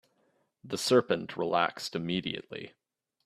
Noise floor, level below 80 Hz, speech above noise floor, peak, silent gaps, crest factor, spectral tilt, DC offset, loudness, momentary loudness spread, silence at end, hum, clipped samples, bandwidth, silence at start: -73 dBFS; -70 dBFS; 42 dB; -10 dBFS; none; 22 dB; -4.5 dB/octave; under 0.1%; -30 LUFS; 17 LU; 0.6 s; none; under 0.1%; 15 kHz; 0.65 s